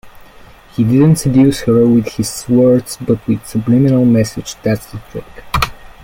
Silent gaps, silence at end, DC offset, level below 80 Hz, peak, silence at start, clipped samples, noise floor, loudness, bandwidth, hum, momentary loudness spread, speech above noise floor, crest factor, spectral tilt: none; 0.15 s; under 0.1%; -36 dBFS; 0 dBFS; 0.05 s; under 0.1%; -40 dBFS; -13 LUFS; 17 kHz; none; 11 LU; 27 dB; 14 dB; -6.5 dB/octave